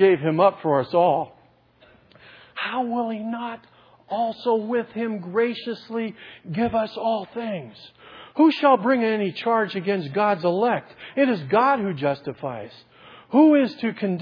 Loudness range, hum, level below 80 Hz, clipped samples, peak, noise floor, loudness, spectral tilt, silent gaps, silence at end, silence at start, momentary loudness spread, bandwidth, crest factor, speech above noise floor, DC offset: 6 LU; none; -64 dBFS; under 0.1%; -4 dBFS; -56 dBFS; -22 LUFS; -8.5 dB/octave; none; 0 s; 0 s; 15 LU; 5.2 kHz; 18 dB; 34 dB; under 0.1%